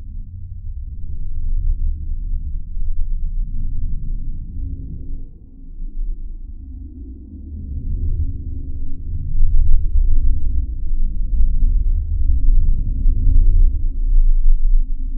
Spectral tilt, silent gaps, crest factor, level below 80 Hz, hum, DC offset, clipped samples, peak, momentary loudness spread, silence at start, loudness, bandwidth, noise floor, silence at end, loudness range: -16 dB/octave; none; 14 dB; -16 dBFS; none; under 0.1%; under 0.1%; 0 dBFS; 15 LU; 0 s; -24 LUFS; 0.5 kHz; -34 dBFS; 0 s; 11 LU